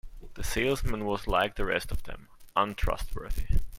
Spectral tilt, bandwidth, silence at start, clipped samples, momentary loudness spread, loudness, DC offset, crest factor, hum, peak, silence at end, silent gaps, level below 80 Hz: -4.5 dB/octave; 16.5 kHz; 0.05 s; under 0.1%; 12 LU; -31 LUFS; under 0.1%; 18 dB; none; -12 dBFS; 0 s; none; -34 dBFS